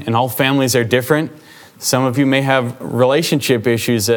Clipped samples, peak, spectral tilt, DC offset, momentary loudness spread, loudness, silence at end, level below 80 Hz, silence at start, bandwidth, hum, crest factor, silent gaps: under 0.1%; 0 dBFS; -4.5 dB/octave; under 0.1%; 4 LU; -15 LUFS; 0 s; -60 dBFS; 0 s; over 20 kHz; none; 16 dB; none